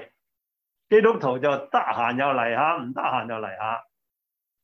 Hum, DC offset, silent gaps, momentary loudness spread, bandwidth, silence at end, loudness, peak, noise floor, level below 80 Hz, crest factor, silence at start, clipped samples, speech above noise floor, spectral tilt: none; under 0.1%; none; 11 LU; 6.4 kHz; 0.8 s; -23 LUFS; -6 dBFS; -84 dBFS; -72 dBFS; 20 dB; 0 s; under 0.1%; 62 dB; -7 dB/octave